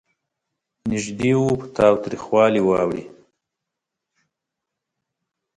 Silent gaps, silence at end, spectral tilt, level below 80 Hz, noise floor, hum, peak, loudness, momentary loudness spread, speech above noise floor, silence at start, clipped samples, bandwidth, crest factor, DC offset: none; 2.5 s; -6.5 dB/octave; -54 dBFS; -83 dBFS; none; -2 dBFS; -20 LUFS; 9 LU; 64 dB; 0.85 s; under 0.1%; 11 kHz; 20 dB; under 0.1%